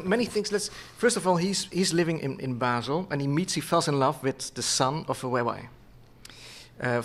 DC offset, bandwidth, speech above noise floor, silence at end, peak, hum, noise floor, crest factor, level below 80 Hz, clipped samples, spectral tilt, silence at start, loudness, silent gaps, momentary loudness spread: under 0.1%; 15.5 kHz; 24 dB; 0 s; -8 dBFS; none; -51 dBFS; 20 dB; -58 dBFS; under 0.1%; -4 dB/octave; 0 s; -27 LUFS; none; 9 LU